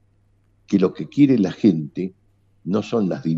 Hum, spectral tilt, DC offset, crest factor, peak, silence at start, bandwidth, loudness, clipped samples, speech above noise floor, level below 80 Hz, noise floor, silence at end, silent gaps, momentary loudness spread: none; -8.5 dB/octave; under 0.1%; 18 dB; -4 dBFS; 0.7 s; 7.6 kHz; -20 LUFS; under 0.1%; 41 dB; -62 dBFS; -60 dBFS; 0 s; none; 13 LU